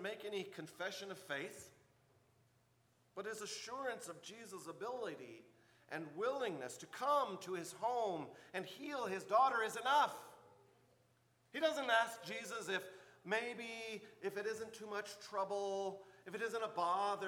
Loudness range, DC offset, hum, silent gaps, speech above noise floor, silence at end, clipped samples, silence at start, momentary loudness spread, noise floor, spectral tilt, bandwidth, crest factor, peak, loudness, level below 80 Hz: 10 LU; under 0.1%; none; none; 34 dB; 0 s; under 0.1%; 0 s; 16 LU; -75 dBFS; -3 dB/octave; 19.5 kHz; 22 dB; -22 dBFS; -41 LUFS; -90 dBFS